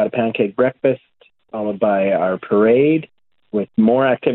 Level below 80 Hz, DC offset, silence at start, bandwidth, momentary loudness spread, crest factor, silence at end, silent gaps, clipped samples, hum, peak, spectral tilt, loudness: -60 dBFS; under 0.1%; 0 s; 4.1 kHz; 11 LU; 16 dB; 0 s; none; under 0.1%; none; -2 dBFS; -11.5 dB/octave; -17 LUFS